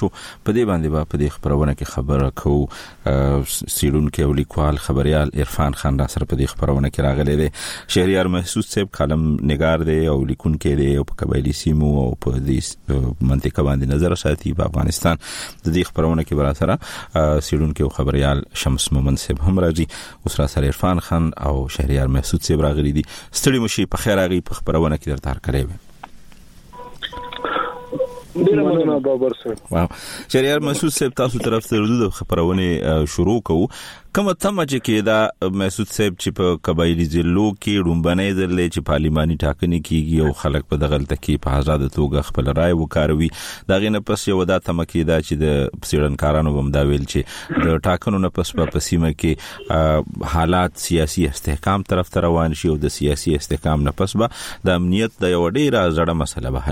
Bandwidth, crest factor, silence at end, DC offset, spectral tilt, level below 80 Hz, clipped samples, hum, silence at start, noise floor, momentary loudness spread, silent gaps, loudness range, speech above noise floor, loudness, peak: 16.5 kHz; 18 dB; 0 s; under 0.1%; -6 dB/octave; -28 dBFS; under 0.1%; none; 0 s; -41 dBFS; 6 LU; none; 1 LU; 23 dB; -19 LUFS; -2 dBFS